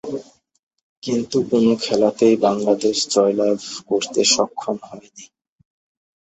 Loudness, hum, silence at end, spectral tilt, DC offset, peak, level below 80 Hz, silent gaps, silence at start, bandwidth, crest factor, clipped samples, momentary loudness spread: -18 LUFS; none; 0.95 s; -3.5 dB/octave; under 0.1%; -2 dBFS; -62 dBFS; 0.59-0.71 s, 0.83-1.02 s; 0.05 s; 8.4 kHz; 18 dB; under 0.1%; 15 LU